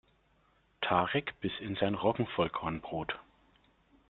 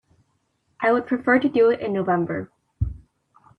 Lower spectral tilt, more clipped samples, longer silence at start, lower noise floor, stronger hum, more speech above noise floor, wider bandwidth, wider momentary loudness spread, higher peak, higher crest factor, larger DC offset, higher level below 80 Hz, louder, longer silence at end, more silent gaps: second, -3.5 dB/octave vs -9 dB/octave; neither; about the same, 0.8 s vs 0.8 s; about the same, -70 dBFS vs -69 dBFS; neither; second, 37 dB vs 49 dB; about the same, 4.4 kHz vs 4.7 kHz; second, 8 LU vs 12 LU; second, -14 dBFS vs -6 dBFS; about the same, 22 dB vs 18 dB; neither; second, -62 dBFS vs -44 dBFS; second, -33 LUFS vs -22 LUFS; first, 0.9 s vs 0.6 s; neither